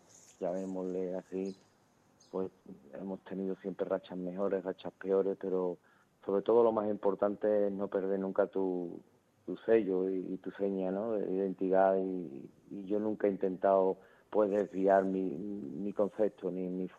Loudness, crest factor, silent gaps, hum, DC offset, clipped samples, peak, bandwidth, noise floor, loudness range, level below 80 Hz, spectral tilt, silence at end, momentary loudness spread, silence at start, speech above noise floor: -34 LUFS; 20 dB; none; none; under 0.1%; under 0.1%; -14 dBFS; 8 kHz; -68 dBFS; 8 LU; -76 dBFS; -8.5 dB/octave; 0.1 s; 14 LU; 0.4 s; 35 dB